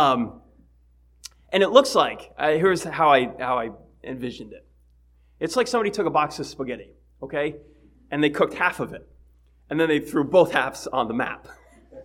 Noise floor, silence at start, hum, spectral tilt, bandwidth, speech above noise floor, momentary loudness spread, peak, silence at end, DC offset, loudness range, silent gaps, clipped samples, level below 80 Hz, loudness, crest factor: -57 dBFS; 0 s; 60 Hz at -55 dBFS; -4.5 dB/octave; 16 kHz; 35 dB; 19 LU; 0 dBFS; 0 s; under 0.1%; 6 LU; none; under 0.1%; -56 dBFS; -23 LUFS; 24 dB